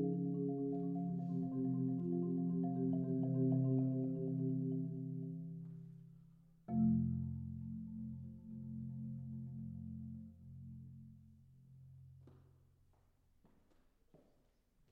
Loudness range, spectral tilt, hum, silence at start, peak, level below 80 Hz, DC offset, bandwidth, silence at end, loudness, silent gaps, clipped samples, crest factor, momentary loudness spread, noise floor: 17 LU; -14.5 dB/octave; none; 0 s; -26 dBFS; -68 dBFS; under 0.1%; 1.7 kHz; 2.5 s; -40 LUFS; none; under 0.1%; 16 dB; 20 LU; -75 dBFS